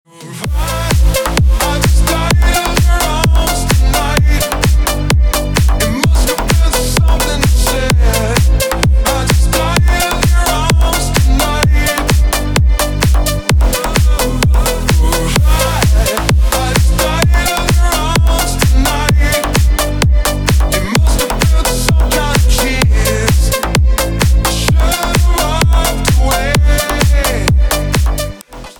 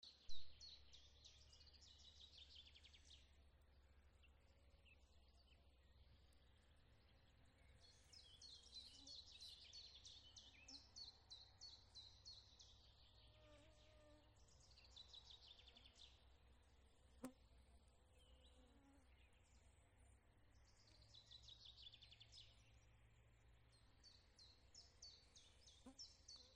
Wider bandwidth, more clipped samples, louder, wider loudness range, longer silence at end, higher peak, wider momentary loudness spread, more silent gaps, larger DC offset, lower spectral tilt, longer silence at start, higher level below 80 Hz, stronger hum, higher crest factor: first, 19.5 kHz vs 9.6 kHz; neither; first, -12 LUFS vs -63 LUFS; second, 1 LU vs 8 LU; about the same, 0.05 s vs 0 s; first, 0 dBFS vs -36 dBFS; second, 2 LU vs 8 LU; neither; first, 0.3% vs under 0.1%; first, -4.5 dB/octave vs -2.5 dB/octave; first, 0.2 s vs 0 s; first, -12 dBFS vs -74 dBFS; neither; second, 10 dB vs 26 dB